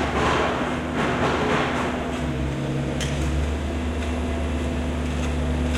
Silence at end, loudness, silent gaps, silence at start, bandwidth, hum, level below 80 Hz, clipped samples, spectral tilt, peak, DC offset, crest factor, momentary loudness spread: 0 s; -25 LUFS; none; 0 s; 12.5 kHz; none; -30 dBFS; under 0.1%; -6 dB/octave; -10 dBFS; under 0.1%; 14 dB; 5 LU